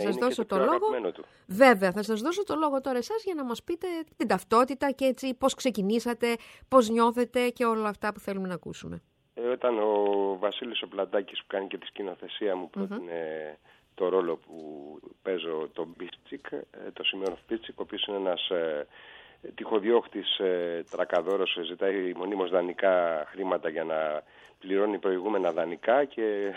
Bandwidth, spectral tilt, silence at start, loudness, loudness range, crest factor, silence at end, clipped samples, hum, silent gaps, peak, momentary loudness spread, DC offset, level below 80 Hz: 16.5 kHz; -4.5 dB/octave; 0 s; -28 LUFS; 7 LU; 24 dB; 0 s; under 0.1%; none; none; -4 dBFS; 14 LU; under 0.1%; -68 dBFS